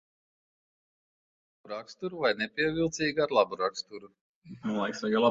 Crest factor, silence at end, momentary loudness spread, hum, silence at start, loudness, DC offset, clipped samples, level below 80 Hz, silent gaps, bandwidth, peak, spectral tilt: 22 dB; 0 s; 15 LU; none; 1.65 s; -30 LUFS; under 0.1%; under 0.1%; -66 dBFS; 4.21-4.42 s; 7.8 kHz; -10 dBFS; -4.5 dB/octave